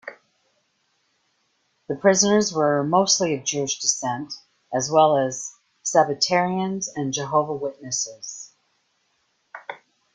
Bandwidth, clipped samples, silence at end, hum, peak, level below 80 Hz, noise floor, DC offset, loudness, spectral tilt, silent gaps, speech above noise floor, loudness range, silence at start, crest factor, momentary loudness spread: 10.5 kHz; under 0.1%; 0.4 s; none; -4 dBFS; -66 dBFS; -69 dBFS; under 0.1%; -22 LUFS; -3 dB/octave; none; 48 dB; 6 LU; 0.05 s; 20 dB; 20 LU